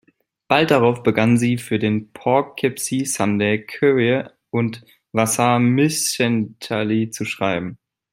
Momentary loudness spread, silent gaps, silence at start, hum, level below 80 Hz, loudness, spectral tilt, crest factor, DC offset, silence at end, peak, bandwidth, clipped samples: 8 LU; none; 0.5 s; none; -60 dBFS; -19 LUFS; -5 dB/octave; 18 dB; under 0.1%; 0.35 s; -2 dBFS; 16 kHz; under 0.1%